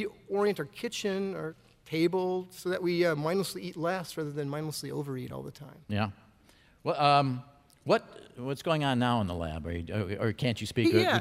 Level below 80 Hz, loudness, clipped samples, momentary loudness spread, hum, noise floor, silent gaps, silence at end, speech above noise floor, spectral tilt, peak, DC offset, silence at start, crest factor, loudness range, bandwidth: -58 dBFS; -31 LUFS; under 0.1%; 12 LU; none; -61 dBFS; none; 0 s; 31 dB; -5.5 dB/octave; -10 dBFS; under 0.1%; 0 s; 22 dB; 5 LU; 16 kHz